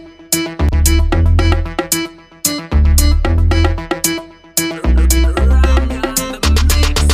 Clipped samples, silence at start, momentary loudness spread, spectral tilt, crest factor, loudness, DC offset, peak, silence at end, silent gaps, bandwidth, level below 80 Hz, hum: under 0.1%; 0 s; 5 LU; -4.5 dB/octave; 12 dB; -14 LUFS; under 0.1%; 0 dBFS; 0 s; none; 16 kHz; -14 dBFS; none